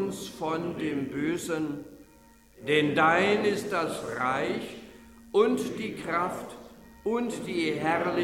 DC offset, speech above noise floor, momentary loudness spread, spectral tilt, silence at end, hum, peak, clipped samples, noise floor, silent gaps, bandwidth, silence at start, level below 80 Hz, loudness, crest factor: under 0.1%; 29 dB; 16 LU; -5 dB/octave; 0 s; none; -10 dBFS; under 0.1%; -56 dBFS; none; 17 kHz; 0 s; -60 dBFS; -28 LUFS; 20 dB